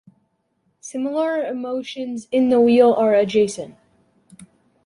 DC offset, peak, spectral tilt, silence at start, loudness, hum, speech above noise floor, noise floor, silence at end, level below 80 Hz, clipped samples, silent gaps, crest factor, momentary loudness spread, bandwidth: under 0.1%; -4 dBFS; -5.5 dB/octave; 0.85 s; -19 LUFS; none; 50 dB; -68 dBFS; 0.4 s; -64 dBFS; under 0.1%; none; 18 dB; 18 LU; 11.5 kHz